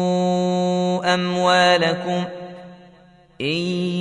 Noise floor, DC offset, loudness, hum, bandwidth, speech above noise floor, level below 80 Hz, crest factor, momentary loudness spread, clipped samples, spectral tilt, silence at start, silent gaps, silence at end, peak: -50 dBFS; under 0.1%; -19 LUFS; none; 10.5 kHz; 31 dB; -60 dBFS; 16 dB; 15 LU; under 0.1%; -5 dB/octave; 0 s; none; 0 s; -4 dBFS